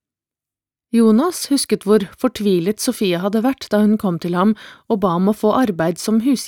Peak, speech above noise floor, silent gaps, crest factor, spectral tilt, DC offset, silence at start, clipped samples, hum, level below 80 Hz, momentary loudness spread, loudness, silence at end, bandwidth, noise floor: -2 dBFS; 73 dB; none; 14 dB; -5.5 dB/octave; under 0.1%; 0.95 s; under 0.1%; none; -56 dBFS; 5 LU; -17 LUFS; 0 s; 18.5 kHz; -89 dBFS